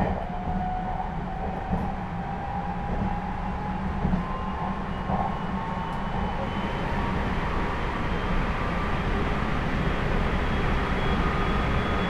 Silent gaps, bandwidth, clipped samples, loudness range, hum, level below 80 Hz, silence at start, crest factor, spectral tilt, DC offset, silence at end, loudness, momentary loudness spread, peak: none; 10 kHz; under 0.1%; 4 LU; none; -32 dBFS; 0 s; 18 dB; -7 dB/octave; under 0.1%; 0 s; -29 LUFS; 5 LU; -10 dBFS